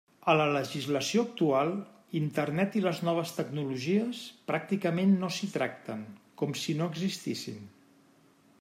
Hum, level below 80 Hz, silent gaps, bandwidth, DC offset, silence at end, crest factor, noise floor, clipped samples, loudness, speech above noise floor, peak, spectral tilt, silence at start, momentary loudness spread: none; -76 dBFS; none; 16 kHz; under 0.1%; 0.9 s; 20 dB; -62 dBFS; under 0.1%; -31 LUFS; 32 dB; -10 dBFS; -5.5 dB/octave; 0.25 s; 12 LU